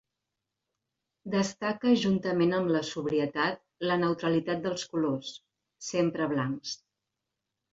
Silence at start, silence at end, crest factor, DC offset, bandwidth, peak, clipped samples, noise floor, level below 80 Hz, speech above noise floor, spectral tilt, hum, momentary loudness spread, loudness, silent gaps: 1.25 s; 1 s; 18 dB; under 0.1%; 8 kHz; -12 dBFS; under 0.1%; -86 dBFS; -70 dBFS; 58 dB; -5.5 dB/octave; none; 11 LU; -29 LUFS; none